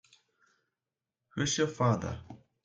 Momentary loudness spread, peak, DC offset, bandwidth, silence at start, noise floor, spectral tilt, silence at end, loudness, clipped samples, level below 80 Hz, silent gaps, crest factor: 15 LU; -16 dBFS; under 0.1%; 9.4 kHz; 1.35 s; under -90 dBFS; -4.5 dB/octave; 0.3 s; -31 LUFS; under 0.1%; -62 dBFS; none; 18 dB